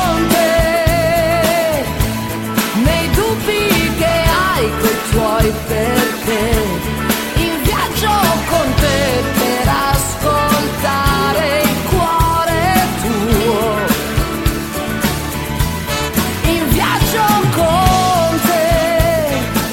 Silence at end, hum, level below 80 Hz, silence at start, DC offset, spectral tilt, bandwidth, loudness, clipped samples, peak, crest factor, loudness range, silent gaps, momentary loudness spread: 0 s; none; -24 dBFS; 0 s; under 0.1%; -4.5 dB/octave; 16.5 kHz; -14 LUFS; under 0.1%; 0 dBFS; 14 dB; 3 LU; none; 5 LU